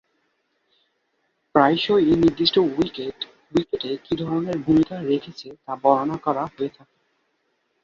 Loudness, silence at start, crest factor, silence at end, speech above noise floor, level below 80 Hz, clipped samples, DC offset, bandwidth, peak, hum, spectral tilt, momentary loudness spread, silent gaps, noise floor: -22 LUFS; 1.55 s; 22 dB; 1.15 s; 50 dB; -54 dBFS; under 0.1%; under 0.1%; 7.2 kHz; -2 dBFS; none; -7 dB/octave; 13 LU; none; -71 dBFS